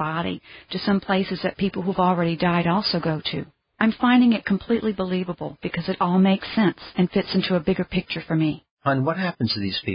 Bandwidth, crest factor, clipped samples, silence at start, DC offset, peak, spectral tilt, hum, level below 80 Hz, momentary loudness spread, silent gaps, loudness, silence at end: 5.4 kHz; 18 dB; under 0.1%; 0 s; under 0.1%; -6 dBFS; -11 dB/octave; none; -52 dBFS; 9 LU; 8.71-8.77 s; -23 LUFS; 0 s